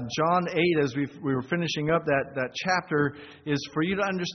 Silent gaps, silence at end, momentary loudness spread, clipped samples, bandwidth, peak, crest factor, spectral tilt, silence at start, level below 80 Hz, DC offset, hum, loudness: none; 0 s; 7 LU; under 0.1%; 6.4 kHz; -10 dBFS; 16 dB; -4 dB/octave; 0 s; -60 dBFS; under 0.1%; none; -27 LUFS